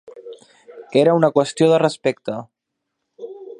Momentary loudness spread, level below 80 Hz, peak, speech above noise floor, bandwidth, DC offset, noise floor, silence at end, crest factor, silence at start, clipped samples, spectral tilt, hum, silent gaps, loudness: 23 LU; -70 dBFS; -2 dBFS; 62 dB; 11 kHz; under 0.1%; -78 dBFS; 0.05 s; 20 dB; 0.15 s; under 0.1%; -6 dB/octave; none; none; -17 LUFS